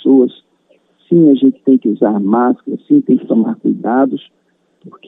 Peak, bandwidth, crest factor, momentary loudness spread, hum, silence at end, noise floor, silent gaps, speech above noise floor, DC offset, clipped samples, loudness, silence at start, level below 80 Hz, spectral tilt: 0 dBFS; 3.9 kHz; 12 dB; 7 LU; none; 0.2 s; -55 dBFS; none; 43 dB; under 0.1%; under 0.1%; -13 LUFS; 0.05 s; -68 dBFS; -11 dB/octave